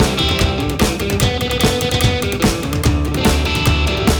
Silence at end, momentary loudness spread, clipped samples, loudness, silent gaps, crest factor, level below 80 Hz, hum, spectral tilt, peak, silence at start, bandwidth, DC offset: 0 s; 2 LU; under 0.1%; -16 LUFS; none; 12 dB; -22 dBFS; none; -4.5 dB/octave; -4 dBFS; 0 s; over 20 kHz; under 0.1%